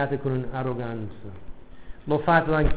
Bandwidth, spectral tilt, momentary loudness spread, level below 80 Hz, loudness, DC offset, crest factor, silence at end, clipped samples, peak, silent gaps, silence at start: 4 kHz; -11 dB/octave; 22 LU; -36 dBFS; -25 LUFS; 1%; 20 dB; 0 s; under 0.1%; -6 dBFS; none; 0 s